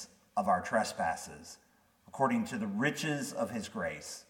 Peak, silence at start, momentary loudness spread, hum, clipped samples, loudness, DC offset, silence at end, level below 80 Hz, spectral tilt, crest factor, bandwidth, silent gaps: -16 dBFS; 0 s; 13 LU; none; under 0.1%; -34 LUFS; under 0.1%; 0.05 s; -68 dBFS; -4.5 dB/octave; 20 dB; 17.5 kHz; none